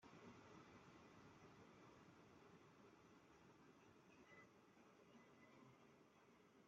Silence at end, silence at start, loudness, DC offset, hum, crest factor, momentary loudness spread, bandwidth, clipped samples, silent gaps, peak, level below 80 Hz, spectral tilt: 0 s; 0 s; -68 LUFS; under 0.1%; none; 16 dB; 5 LU; 7.4 kHz; under 0.1%; none; -52 dBFS; under -90 dBFS; -4.5 dB/octave